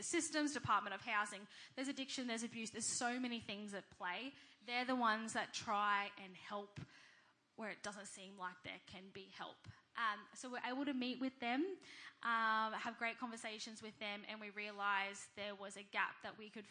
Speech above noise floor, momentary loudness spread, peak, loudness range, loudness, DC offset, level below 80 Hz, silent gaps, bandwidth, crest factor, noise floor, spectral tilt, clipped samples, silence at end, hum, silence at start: 28 dB; 15 LU; -24 dBFS; 7 LU; -43 LUFS; under 0.1%; -86 dBFS; none; 10.5 kHz; 20 dB; -72 dBFS; -2.5 dB/octave; under 0.1%; 0 s; none; 0 s